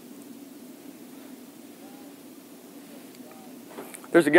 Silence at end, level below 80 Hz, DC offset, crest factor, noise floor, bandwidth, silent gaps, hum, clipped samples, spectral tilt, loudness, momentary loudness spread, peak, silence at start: 0 s; -84 dBFS; under 0.1%; 26 dB; -47 dBFS; 16 kHz; none; none; under 0.1%; -5 dB/octave; -34 LUFS; 6 LU; -2 dBFS; 3.75 s